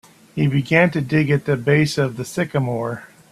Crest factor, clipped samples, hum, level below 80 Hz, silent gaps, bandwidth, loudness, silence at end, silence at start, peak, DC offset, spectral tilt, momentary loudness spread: 20 dB; under 0.1%; none; -54 dBFS; none; 13.5 kHz; -19 LUFS; 0.25 s; 0.35 s; 0 dBFS; under 0.1%; -6.5 dB/octave; 10 LU